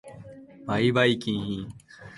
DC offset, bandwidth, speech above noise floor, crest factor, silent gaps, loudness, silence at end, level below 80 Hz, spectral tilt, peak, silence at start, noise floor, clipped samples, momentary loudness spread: under 0.1%; 11.5 kHz; 21 dB; 20 dB; none; -25 LUFS; 0 s; -56 dBFS; -6 dB/octave; -6 dBFS; 0.05 s; -46 dBFS; under 0.1%; 24 LU